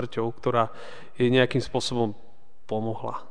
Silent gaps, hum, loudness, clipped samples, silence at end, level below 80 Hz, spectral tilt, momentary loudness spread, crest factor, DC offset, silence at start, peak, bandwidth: none; none; -26 LUFS; under 0.1%; 0.05 s; -56 dBFS; -6 dB/octave; 12 LU; 20 dB; 2%; 0 s; -8 dBFS; 10 kHz